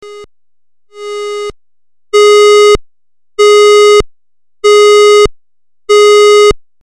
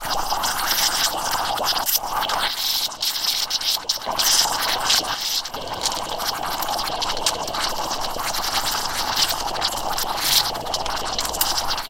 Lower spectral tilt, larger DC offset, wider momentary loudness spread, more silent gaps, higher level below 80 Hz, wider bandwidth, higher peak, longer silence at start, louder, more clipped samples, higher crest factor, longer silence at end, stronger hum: first, -2 dB/octave vs 0 dB/octave; first, 0.6% vs under 0.1%; first, 17 LU vs 7 LU; neither; first, -32 dBFS vs -42 dBFS; second, 13 kHz vs 17 kHz; about the same, -2 dBFS vs -2 dBFS; about the same, 0.05 s vs 0 s; first, -6 LUFS vs -21 LUFS; neither; second, 6 dB vs 22 dB; first, 0.25 s vs 0 s; neither